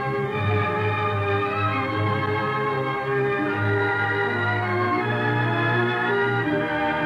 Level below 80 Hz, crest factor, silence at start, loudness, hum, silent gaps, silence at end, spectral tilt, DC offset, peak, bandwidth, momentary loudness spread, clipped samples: -58 dBFS; 14 dB; 0 s; -23 LUFS; none; none; 0 s; -7.5 dB/octave; under 0.1%; -10 dBFS; 7.6 kHz; 2 LU; under 0.1%